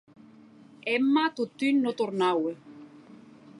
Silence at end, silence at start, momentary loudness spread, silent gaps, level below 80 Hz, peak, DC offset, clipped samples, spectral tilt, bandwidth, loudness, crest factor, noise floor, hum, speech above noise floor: 0 s; 0.85 s; 10 LU; none; -82 dBFS; -14 dBFS; under 0.1%; under 0.1%; -5.5 dB/octave; 11 kHz; -27 LUFS; 16 dB; -53 dBFS; none; 27 dB